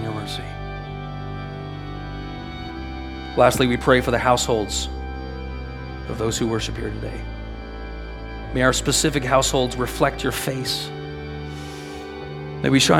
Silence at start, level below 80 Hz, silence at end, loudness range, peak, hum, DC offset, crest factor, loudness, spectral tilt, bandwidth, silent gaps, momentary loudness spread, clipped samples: 0 s; -36 dBFS; 0 s; 7 LU; 0 dBFS; none; under 0.1%; 22 dB; -23 LUFS; -4 dB/octave; 18 kHz; none; 16 LU; under 0.1%